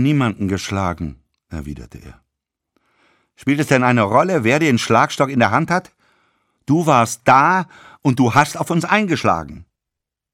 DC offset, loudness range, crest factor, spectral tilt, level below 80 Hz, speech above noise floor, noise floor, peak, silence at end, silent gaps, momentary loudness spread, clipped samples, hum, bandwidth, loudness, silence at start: under 0.1%; 8 LU; 18 dB; -5.5 dB/octave; -46 dBFS; 67 dB; -83 dBFS; 0 dBFS; 0.7 s; none; 17 LU; under 0.1%; none; 16.5 kHz; -16 LUFS; 0 s